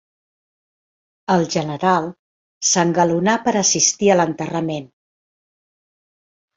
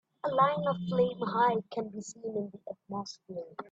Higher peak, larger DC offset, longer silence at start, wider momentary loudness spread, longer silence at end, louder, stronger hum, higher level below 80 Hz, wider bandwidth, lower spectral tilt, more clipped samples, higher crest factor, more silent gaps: first, -2 dBFS vs -12 dBFS; neither; first, 1.3 s vs 0.25 s; second, 10 LU vs 15 LU; first, 1.7 s vs 0.05 s; first, -17 LUFS vs -31 LUFS; neither; first, -60 dBFS vs -70 dBFS; about the same, 8.2 kHz vs 8 kHz; second, -3.5 dB/octave vs -6 dB/octave; neither; about the same, 20 dB vs 20 dB; first, 2.19-2.61 s vs none